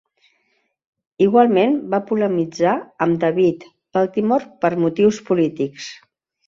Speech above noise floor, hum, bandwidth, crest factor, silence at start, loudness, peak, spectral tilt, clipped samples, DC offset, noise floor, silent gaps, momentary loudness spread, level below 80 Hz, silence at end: 50 dB; none; 7.6 kHz; 16 dB; 1.2 s; -18 LUFS; -2 dBFS; -7 dB/octave; under 0.1%; under 0.1%; -67 dBFS; none; 10 LU; -60 dBFS; 0.55 s